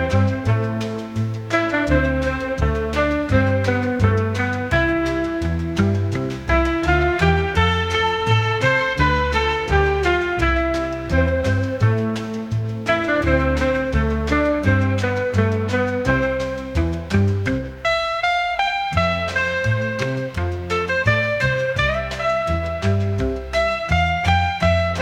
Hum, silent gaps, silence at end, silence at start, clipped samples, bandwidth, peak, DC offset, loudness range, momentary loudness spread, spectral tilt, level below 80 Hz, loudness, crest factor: none; none; 0 s; 0 s; under 0.1%; 10.5 kHz; -2 dBFS; under 0.1%; 2 LU; 5 LU; -6.5 dB/octave; -32 dBFS; -20 LUFS; 16 dB